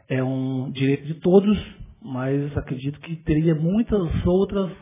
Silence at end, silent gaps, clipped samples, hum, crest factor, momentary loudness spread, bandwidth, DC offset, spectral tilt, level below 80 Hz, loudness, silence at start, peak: 0.05 s; none; under 0.1%; none; 18 dB; 13 LU; 3.8 kHz; under 0.1%; -12 dB/octave; -38 dBFS; -22 LUFS; 0.1 s; -4 dBFS